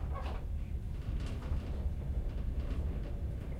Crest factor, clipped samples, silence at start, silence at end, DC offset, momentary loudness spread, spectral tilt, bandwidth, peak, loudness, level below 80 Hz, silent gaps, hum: 12 dB; under 0.1%; 0 s; 0 s; under 0.1%; 3 LU; -8 dB/octave; 9.8 kHz; -24 dBFS; -40 LUFS; -38 dBFS; none; none